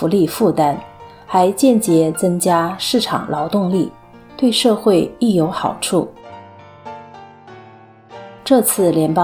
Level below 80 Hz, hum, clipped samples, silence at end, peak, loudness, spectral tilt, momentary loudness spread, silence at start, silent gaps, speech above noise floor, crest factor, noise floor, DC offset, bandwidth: -54 dBFS; none; under 0.1%; 0 s; -2 dBFS; -16 LUFS; -5 dB/octave; 16 LU; 0 s; none; 28 dB; 16 dB; -43 dBFS; under 0.1%; 19 kHz